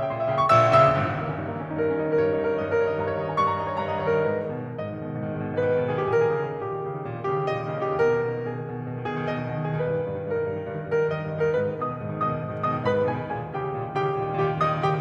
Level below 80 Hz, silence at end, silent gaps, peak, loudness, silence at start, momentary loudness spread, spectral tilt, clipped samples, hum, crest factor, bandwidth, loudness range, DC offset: -56 dBFS; 0 s; none; -4 dBFS; -25 LUFS; 0 s; 8 LU; -8 dB/octave; under 0.1%; none; 20 dB; 8.4 kHz; 4 LU; under 0.1%